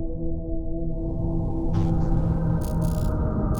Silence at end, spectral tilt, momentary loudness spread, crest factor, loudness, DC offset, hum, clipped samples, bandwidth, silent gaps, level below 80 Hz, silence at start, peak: 0 s; -9 dB/octave; 7 LU; 12 dB; -27 LUFS; under 0.1%; none; under 0.1%; 19 kHz; none; -28 dBFS; 0 s; -10 dBFS